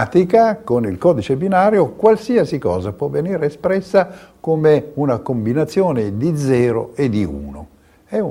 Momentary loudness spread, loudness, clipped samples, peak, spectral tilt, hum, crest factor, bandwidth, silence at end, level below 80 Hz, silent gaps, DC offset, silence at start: 8 LU; -17 LUFS; under 0.1%; 0 dBFS; -8 dB/octave; none; 16 dB; 16 kHz; 0 s; -46 dBFS; none; under 0.1%; 0 s